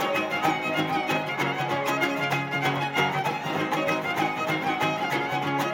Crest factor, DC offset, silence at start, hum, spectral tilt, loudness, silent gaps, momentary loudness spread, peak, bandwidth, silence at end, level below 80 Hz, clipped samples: 16 dB; under 0.1%; 0 s; none; -4.5 dB/octave; -26 LUFS; none; 2 LU; -10 dBFS; 17 kHz; 0 s; -72 dBFS; under 0.1%